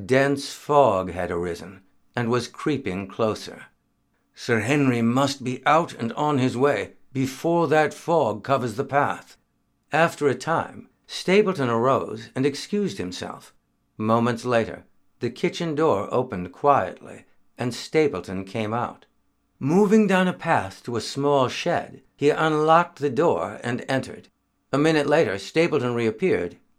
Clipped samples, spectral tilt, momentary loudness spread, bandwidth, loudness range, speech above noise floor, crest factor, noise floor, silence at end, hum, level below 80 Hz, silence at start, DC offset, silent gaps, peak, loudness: under 0.1%; -6 dB/octave; 12 LU; 14.5 kHz; 4 LU; 46 dB; 22 dB; -69 dBFS; 0.25 s; none; -62 dBFS; 0 s; under 0.1%; none; -2 dBFS; -23 LUFS